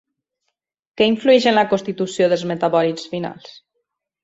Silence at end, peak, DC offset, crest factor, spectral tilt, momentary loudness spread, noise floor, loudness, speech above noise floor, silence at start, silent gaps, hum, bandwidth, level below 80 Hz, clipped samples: 0.75 s; -2 dBFS; under 0.1%; 18 dB; -5 dB/octave; 13 LU; -76 dBFS; -18 LUFS; 59 dB; 1 s; none; none; 8 kHz; -62 dBFS; under 0.1%